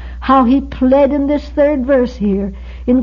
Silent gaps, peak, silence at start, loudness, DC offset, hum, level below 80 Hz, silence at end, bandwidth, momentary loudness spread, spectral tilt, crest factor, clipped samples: none; -2 dBFS; 0 s; -13 LUFS; under 0.1%; none; -28 dBFS; 0 s; 6.6 kHz; 7 LU; -8.5 dB/octave; 12 dB; under 0.1%